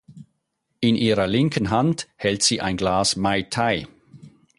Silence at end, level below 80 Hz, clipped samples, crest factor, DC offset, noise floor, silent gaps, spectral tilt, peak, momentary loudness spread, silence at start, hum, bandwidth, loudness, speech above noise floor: 0.3 s; -48 dBFS; under 0.1%; 18 dB; under 0.1%; -75 dBFS; none; -4 dB/octave; -6 dBFS; 5 LU; 0.1 s; none; 11.5 kHz; -21 LUFS; 54 dB